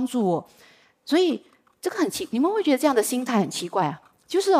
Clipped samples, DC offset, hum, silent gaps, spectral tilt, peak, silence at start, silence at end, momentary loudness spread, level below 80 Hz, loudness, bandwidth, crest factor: under 0.1%; under 0.1%; none; none; -4.5 dB/octave; -8 dBFS; 0 s; 0 s; 10 LU; -72 dBFS; -24 LUFS; 16 kHz; 16 dB